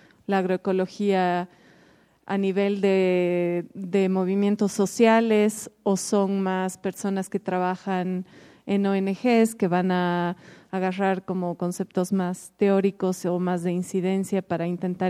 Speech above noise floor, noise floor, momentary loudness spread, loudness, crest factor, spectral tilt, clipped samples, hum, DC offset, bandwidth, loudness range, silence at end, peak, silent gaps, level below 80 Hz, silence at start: 34 dB; -57 dBFS; 9 LU; -24 LUFS; 18 dB; -6 dB/octave; under 0.1%; none; under 0.1%; 15 kHz; 4 LU; 0 s; -6 dBFS; none; -72 dBFS; 0.3 s